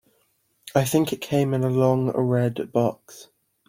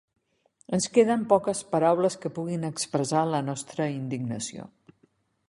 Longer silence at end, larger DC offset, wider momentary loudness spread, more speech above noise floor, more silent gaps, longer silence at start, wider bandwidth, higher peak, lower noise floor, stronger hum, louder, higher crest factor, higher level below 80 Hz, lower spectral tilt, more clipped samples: second, 0.45 s vs 0.8 s; neither; second, 4 LU vs 10 LU; first, 45 dB vs 41 dB; neither; about the same, 0.65 s vs 0.7 s; first, 16.5 kHz vs 11.5 kHz; about the same, -4 dBFS vs -6 dBFS; about the same, -67 dBFS vs -67 dBFS; neither; first, -23 LUFS vs -26 LUFS; about the same, 20 dB vs 20 dB; first, -60 dBFS vs -66 dBFS; first, -6.5 dB/octave vs -5 dB/octave; neither